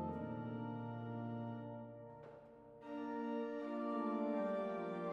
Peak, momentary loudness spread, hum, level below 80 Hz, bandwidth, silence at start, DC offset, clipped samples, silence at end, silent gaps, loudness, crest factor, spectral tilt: -30 dBFS; 16 LU; none; -78 dBFS; 7 kHz; 0 s; under 0.1%; under 0.1%; 0 s; none; -44 LUFS; 14 dB; -9 dB/octave